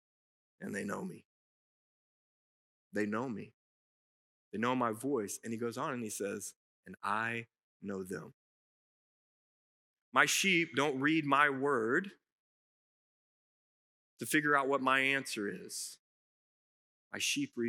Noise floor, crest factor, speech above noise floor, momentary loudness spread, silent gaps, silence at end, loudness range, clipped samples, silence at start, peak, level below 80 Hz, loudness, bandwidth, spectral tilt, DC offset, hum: under -90 dBFS; 26 dB; over 56 dB; 16 LU; 1.25-2.91 s, 3.54-4.52 s, 6.56-6.83 s, 7.63-7.80 s, 8.34-10.12 s, 12.32-14.17 s, 15.99-17.11 s; 0 s; 11 LU; under 0.1%; 0.6 s; -10 dBFS; under -90 dBFS; -33 LUFS; 16 kHz; -3.5 dB/octave; under 0.1%; none